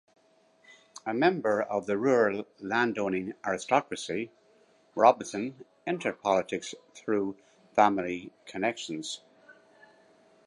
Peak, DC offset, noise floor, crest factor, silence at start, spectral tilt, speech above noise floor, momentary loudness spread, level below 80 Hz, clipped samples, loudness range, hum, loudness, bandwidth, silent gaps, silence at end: -6 dBFS; under 0.1%; -64 dBFS; 24 dB; 1.05 s; -4.5 dB/octave; 36 dB; 15 LU; -72 dBFS; under 0.1%; 3 LU; none; -29 LUFS; 11.5 kHz; none; 0.95 s